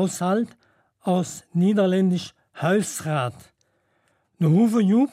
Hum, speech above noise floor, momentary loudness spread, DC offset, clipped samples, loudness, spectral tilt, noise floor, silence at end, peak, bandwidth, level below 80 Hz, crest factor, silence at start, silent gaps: none; 47 dB; 11 LU; under 0.1%; under 0.1%; -22 LUFS; -6.5 dB/octave; -68 dBFS; 0.05 s; -8 dBFS; 15.5 kHz; -70 dBFS; 14 dB; 0 s; none